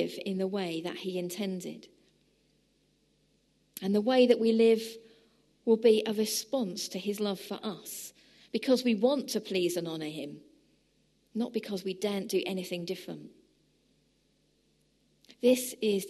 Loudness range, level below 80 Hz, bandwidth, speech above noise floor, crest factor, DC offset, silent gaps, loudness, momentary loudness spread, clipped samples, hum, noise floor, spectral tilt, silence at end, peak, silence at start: 10 LU; -78 dBFS; 13 kHz; 41 dB; 22 dB; under 0.1%; none; -30 LUFS; 17 LU; under 0.1%; 50 Hz at -75 dBFS; -71 dBFS; -4.5 dB/octave; 0 s; -10 dBFS; 0 s